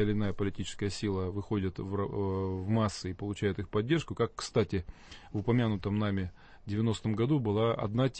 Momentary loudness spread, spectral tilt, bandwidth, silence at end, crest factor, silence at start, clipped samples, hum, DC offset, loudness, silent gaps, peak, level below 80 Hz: 8 LU; -7 dB/octave; 8.8 kHz; 0 s; 16 dB; 0 s; under 0.1%; none; under 0.1%; -32 LUFS; none; -16 dBFS; -52 dBFS